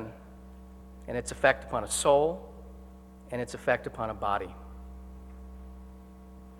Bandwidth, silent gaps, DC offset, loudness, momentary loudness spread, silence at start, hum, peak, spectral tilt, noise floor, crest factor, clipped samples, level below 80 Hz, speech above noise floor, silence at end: 17.5 kHz; none; under 0.1%; -29 LUFS; 24 LU; 0 s; none; -8 dBFS; -3.5 dB/octave; -49 dBFS; 24 dB; under 0.1%; -48 dBFS; 21 dB; 0 s